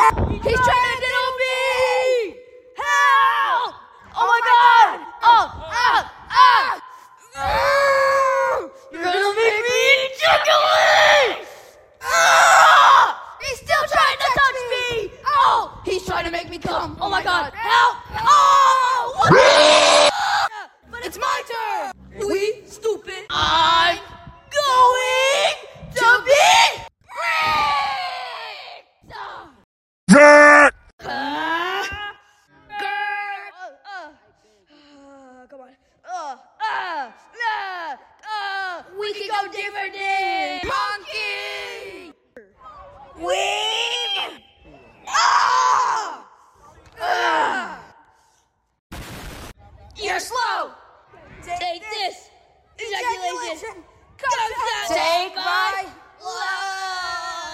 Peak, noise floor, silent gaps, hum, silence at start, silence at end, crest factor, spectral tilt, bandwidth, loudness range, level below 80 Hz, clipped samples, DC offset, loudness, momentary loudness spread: 0 dBFS; -64 dBFS; 29.64-30.07 s, 30.93-30.98 s, 48.79-48.90 s; none; 0 s; 0 s; 20 dB; -2.5 dB/octave; 16 kHz; 14 LU; -46 dBFS; under 0.1%; under 0.1%; -17 LUFS; 20 LU